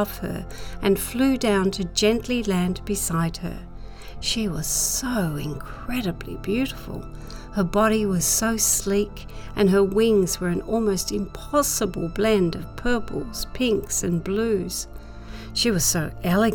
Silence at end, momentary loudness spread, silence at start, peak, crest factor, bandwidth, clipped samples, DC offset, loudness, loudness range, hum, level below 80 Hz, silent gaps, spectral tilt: 0 s; 15 LU; 0 s; -6 dBFS; 18 dB; over 20 kHz; under 0.1%; under 0.1%; -23 LUFS; 5 LU; none; -38 dBFS; none; -4 dB/octave